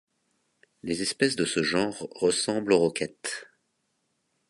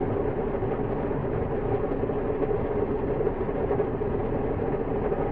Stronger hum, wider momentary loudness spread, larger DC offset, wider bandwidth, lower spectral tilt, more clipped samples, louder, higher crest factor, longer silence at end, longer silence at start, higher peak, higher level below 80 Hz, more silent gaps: neither; first, 11 LU vs 2 LU; neither; first, 11.5 kHz vs 4.1 kHz; second, -3.5 dB/octave vs -8.5 dB/octave; neither; about the same, -27 LUFS vs -28 LUFS; first, 20 dB vs 14 dB; first, 1.05 s vs 0 s; first, 0.85 s vs 0 s; first, -8 dBFS vs -14 dBFS; second, -64 dBFS vs -38 dBFS; neither